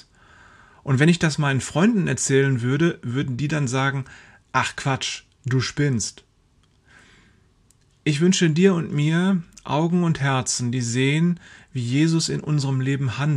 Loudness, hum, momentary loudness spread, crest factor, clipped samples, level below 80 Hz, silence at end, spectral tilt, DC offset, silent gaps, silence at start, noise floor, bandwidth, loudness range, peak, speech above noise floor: -22 LUFS; none; 8 LU; 18 dB; under 0.1%; -56 dBFS; 0 s; -5.5 dB/octave; under 0.1%; none; 0.85 s; -60 dBFS; 11.5 kHz; 6 LU; -4 dBFS; 39 dB